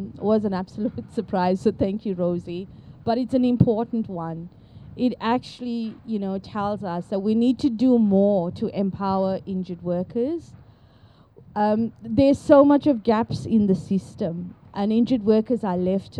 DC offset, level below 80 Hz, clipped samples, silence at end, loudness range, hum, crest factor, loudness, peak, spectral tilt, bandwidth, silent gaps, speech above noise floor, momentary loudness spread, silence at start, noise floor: under 0.1%; -52 dBFS; under 0.1%; 0 s; 7 LU; none; 20 dB; -23 LUFS; -2 dBFS; -8.5 dB/octave; 9.8 kHz; none; 31 dB; 12 LU; 0 s; -52 dBFS